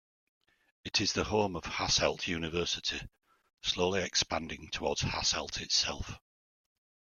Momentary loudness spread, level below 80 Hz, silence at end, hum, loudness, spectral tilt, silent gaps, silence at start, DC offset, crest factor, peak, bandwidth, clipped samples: 10 LU; -54 dBFS; 1 s; none; -31 LUFS; -2.5 dB/octave; none; 0.85 s; under 0.1%; 22 dB; -12 dBFS; 13.5 kHz; under 0.1%